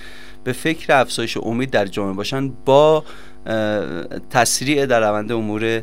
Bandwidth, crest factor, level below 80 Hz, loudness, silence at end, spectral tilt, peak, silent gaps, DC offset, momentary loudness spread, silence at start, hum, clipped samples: 16 kHz; 18 dB; -48 dBFS; -18 LUFS; 0 s; -4 dB/octave; 0 dBFS; none; 2%; 12 LU; 0 s; none; under 0.1%